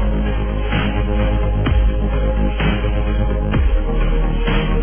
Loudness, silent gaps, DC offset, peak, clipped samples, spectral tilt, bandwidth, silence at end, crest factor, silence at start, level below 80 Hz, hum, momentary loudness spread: -19 LUFS; none; 1%; -6 dBFS; under 0.1%; -11 dB/octave; 3.5 kHz; 0 s; 10 dB; 0 s; -18 dBFS; none; 2 LU